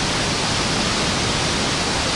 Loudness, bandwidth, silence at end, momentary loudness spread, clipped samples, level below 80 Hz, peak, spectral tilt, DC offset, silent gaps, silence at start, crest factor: -19 LUFS; 11.5 kHz; 0 s; 1 LU; under 0.1%; -36 dBFS; -8 dBFS; -3 dB/octave; under 0.1%; none; 0 s; 14 dB